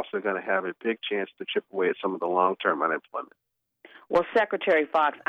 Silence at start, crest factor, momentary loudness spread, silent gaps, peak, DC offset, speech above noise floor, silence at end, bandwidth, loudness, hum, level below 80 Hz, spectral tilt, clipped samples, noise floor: 0 s; 20 dB; 8 LU; none; -8 dBFS; under 0.1%; 29 dB; 0.1 s; 7.4 kHz; -26 LUFS; none; -70 dBFS; -6 dB/octave; under 0.1%; -55 dBFS